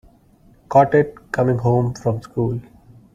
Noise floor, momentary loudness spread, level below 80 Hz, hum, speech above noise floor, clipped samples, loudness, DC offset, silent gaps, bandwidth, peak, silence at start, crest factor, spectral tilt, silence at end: -52 dBFS; 10 LU; -48 dBFS; none; 35 dB; under 0.1%; -19 LUFS; under 0.1%; none; 7.6 kHz; -2 dBFS; 0.7 s; 18 dB; -8.5 dB/octave; 0.5 s